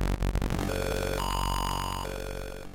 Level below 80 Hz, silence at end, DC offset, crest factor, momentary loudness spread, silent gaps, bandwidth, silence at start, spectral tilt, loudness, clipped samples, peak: -34 dBFS; 0 s; under 0.1%; 12 dB; 7 LU; none; 17 kHz; 0 s; -5 dB/octave; -31 LUFS; under 0.1%; -18 dBFS